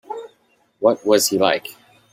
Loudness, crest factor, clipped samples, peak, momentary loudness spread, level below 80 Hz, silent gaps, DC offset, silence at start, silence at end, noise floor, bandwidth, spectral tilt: -18 LUFS; 18 dB; under 0.1%; -2 dBFS; 18 LU; -66 dBFS; none; under 0.1%; 0.1 s; 0.4 s; -61 dBFS; 16 kHz; -3 dB/octave